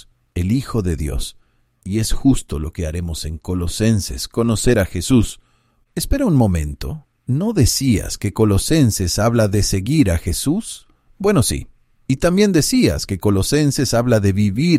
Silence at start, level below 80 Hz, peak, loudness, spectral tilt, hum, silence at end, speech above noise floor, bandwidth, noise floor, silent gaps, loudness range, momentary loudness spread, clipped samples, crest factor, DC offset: 0.35 s; -30 dBFS; -2 dBFS; -18 LUFS; -5.5 dB/octave; none; 0 s; 43 dB; 16 kHz; -59 dBFS; none; 5 LU; 11 LU; under 0.1%; 16 dB; under 0.1%